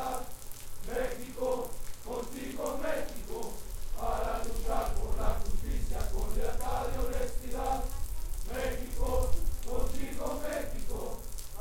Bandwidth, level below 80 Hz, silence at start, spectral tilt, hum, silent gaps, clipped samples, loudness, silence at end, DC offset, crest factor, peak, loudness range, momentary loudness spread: 17 kHz; -34 dBFS; 0 s; -5 dB/octave; none; none; under 0.1%; -37 LUFS; 0 s; under 0.1%; 16 dB; -14 dBFS; 1 LU; 8 LU